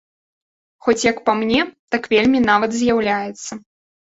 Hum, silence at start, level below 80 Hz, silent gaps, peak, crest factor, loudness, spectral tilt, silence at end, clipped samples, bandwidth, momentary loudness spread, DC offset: none; 0.85 s; -52 dBFS; 1.79-1.88 s; -2 dBFS; 18 dB; -18 LUFS; -4 dB/octave; 0.45 s; under 0.1%; 8 kHz; 13 LU; under 0.1%